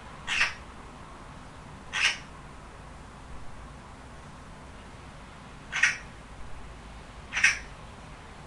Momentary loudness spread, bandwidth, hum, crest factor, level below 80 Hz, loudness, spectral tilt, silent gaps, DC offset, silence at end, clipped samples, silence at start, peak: 21 LU; 11.5 kHz; none; 28 dB; -50 dBFS; -27 LUFS; -1 dB/octave; none; under 0.1%; 0 s; under 0.1%; 0 s; -6 dBFS